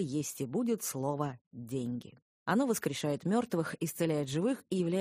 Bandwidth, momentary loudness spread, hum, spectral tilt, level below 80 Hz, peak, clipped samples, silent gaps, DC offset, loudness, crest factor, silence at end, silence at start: 15.5 kHz; 8 LU; none; -5.5 dB/octave; -72 dBFS; -16 dBFS; under 0.1%; 1.41-1.51 s, 2.22-2.46 s; under 0.1%; -34 LUFS; 18 dB; 0 s; 0 s